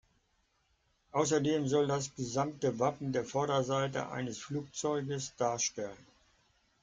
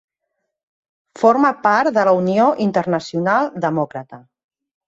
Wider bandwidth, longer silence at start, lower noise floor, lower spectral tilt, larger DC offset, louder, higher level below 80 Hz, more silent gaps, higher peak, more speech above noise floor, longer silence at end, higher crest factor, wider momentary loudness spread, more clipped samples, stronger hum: first, 9.6 kHz vs 8 kHz; about the same, 1.15 s vs 1.2 s; about the same, -75 dBFS vs -76 dBFS; second, -4.5 dB/octave vs -7 dB/octave; neither; second, -34 LUFS vs -17 LUFS; about the same, -68 dBFS vs -64 dBFS; neither; second, -16 dBFS vs -2 dBFS; second, 42 dB vs 60 dB; first, 0.85 s vs 0.7 s; about the same, 20 dB vs 16 dB; about the same, 8 LU vs 7 LU; neither; neither